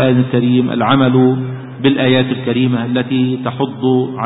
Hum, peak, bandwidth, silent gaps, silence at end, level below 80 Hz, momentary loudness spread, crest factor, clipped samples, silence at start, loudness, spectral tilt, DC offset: none; 0 dBFS; 4 kHz; none; 0 s; -52 dBFS; 6 LU; 14 dB; under 0.1%; 0 s; -14 LUFS; -12.5 dB/octave; under 0.1%